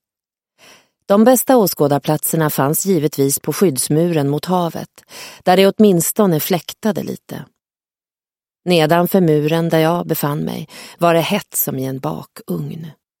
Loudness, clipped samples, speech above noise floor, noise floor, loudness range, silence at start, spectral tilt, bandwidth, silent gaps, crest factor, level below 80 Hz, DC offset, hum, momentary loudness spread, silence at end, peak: -16 LUFS; under 0.1%; over 74 dB; under -90 dBFS; 4 LU; 1.1 s; -5 dB/octave; 17 kHz; none; 16 dB; -60 dBFS; under 0.1%; none; 17 LU; 0.3 s; 0 dBFS